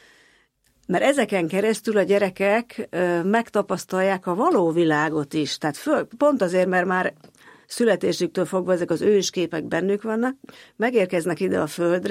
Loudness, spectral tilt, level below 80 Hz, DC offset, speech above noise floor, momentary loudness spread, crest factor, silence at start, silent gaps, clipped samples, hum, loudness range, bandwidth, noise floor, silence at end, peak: -22 LUFS; -5 dB/octave; -68 dBFS; under 0.1%; 41 dB; 6 LU; 16 dB; 0.9 s; none; under 0.1%; none; 2 LU; 16 kHz; -63 dBFS; 0 s; -6 dBFS